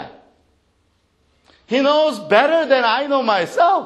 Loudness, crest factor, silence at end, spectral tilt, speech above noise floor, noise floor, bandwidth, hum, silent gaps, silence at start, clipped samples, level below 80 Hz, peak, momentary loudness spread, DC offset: -16 LUFS; 18 dB; 0 s; -4 dB/octave; 47 dB; -63 dBFS; 12.5 kHz; none; none; 0 s; under 0.1%; -66 dBFS; 0 dBFS; 4 LU; under 0.1%